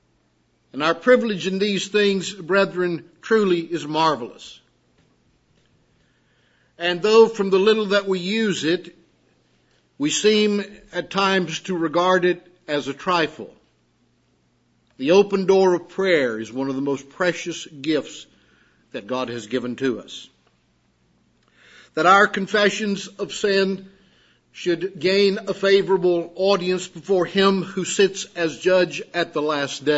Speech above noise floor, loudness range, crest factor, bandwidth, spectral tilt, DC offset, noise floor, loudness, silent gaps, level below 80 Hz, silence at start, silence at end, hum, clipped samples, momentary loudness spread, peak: 44 dB; 7 LU; 20 dB; 8 kHz; -4.5 dB/octave; under 0.1%; -64 dBFS; -21 LUFS; none; -68 dBFS; 0.75 s; 0 s; none; under 0.1%; 12 LU; -2 dBFS